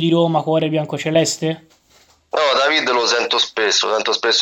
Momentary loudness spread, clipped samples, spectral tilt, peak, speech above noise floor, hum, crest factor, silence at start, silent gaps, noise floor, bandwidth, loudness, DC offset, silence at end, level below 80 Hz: 7 LU; under 0.1%; -3.5 dB/octave; -2 dBFS; 37 dB; none; 16 dB; 0 s; none; -54 dBFS; 16 kHz; -17 LUFS; under 0.1%; 0 s; -64 dBFS